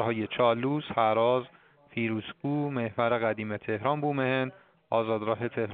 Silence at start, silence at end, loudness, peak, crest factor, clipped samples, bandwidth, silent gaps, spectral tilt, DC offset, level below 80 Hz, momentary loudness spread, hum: 0 s; 0 s; -29 LUFS; -10 dBFS; 18 dB; under 0.1%; 4.6 kHz; none; -5 dB/octave; under 0.1%; -70 dBFS; 7 LU; none